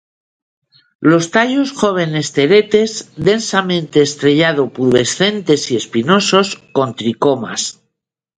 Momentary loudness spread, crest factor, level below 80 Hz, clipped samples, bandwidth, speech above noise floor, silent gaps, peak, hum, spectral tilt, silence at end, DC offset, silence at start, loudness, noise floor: 7 LU; 14 dB; -54 dBFS; under 0.1%; 9.6 kHz; 60 dB; none; 0 dBFS; none; -4.5 dB/octave; 0.65 s; under 0.1%; 1 s; -14 LUFS; -74 dBFS